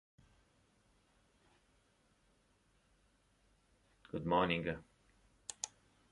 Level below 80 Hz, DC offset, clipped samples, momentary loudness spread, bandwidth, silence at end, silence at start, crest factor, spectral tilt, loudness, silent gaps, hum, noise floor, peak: -68 dBFS; under 0.1%; under 0.1%; 17 LU; 11 kHz; 0.45 s; 4.15 s; 26 dB; -4.5 dB/octave; -39 LUFS; none; none; -74 dBFS; -18 dBFS